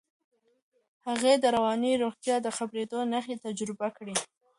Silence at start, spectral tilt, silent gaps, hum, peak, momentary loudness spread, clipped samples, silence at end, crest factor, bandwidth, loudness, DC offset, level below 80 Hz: 1.05 s; -3.5 dB/octave; none; none; -12 dBFS; 11 LU; under 0.1%; 0.35 s; 18 dB; 11.5 kHz; -29 LUFS; under 0.1%; -72 dBFS